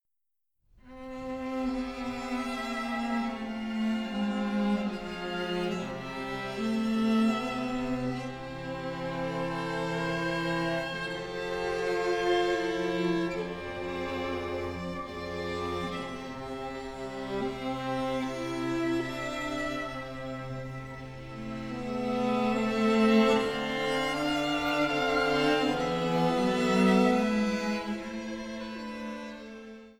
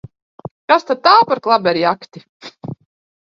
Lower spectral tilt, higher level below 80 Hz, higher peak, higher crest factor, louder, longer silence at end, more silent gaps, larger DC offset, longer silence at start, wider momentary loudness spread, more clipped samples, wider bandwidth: about the same, -5.5 dB/octave vs -5.5 dB/octave; first, -54 dBFS vs -60 dBFS; second, -12 dBFS vs 0 dBFS; about the same, 18 dB vs 18 dB; second, -30 LUFS vs -14 LUFS; second, 0.05 s vs 0.6 s; second, none vs 2.29-2.40 s; neither; first, 0.85 s vs 0.7 s; second, 12 LU vs 24 LU; neither; first, 15 kHz vs 7.4 kHz